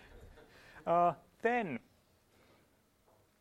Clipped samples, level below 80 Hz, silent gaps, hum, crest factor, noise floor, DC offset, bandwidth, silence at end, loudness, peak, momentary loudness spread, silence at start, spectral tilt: under 0.1%; -68 dBFS; none; none; 20 dB; -71 dBFS; under 0.1%; 13 kHz; 1.6 s; -34 LUFS; -20 dBFS; 15 LU; 0.15 s; -7 dB/octave